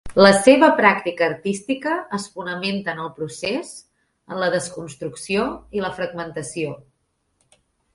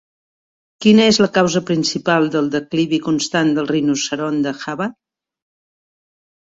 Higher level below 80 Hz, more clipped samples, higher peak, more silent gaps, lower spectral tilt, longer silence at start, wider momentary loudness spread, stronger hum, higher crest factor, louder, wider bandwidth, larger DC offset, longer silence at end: about the same, -54 dBFS vs -58 dBFS; neither; about the same, 0 dBFS vs -2 dBFS; neither; about the same, -4.5 dB/octave vs -4.5 dB/octave; second, 0.05 s vs 0.8 s; first, 19 LU vs 10 LU; neither; about the same, 20 dB vs 16 dB; second, -20 LUFS vs -17 LUFS; first, 11.5 kHz vs 7.8 kHz; neither; second, 1.2 s vs 1.55 s